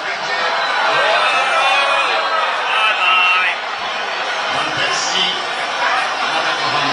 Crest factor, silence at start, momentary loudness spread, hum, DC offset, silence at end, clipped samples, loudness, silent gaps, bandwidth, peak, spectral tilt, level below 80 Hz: 14 dB; 0 s; 7 LU; none; under 0.1%; 0 s; under 0.1%; -15 LUFS; none; 11.5 kHz; -2 dBFS; -0.5 dB/octave; -66 dBFS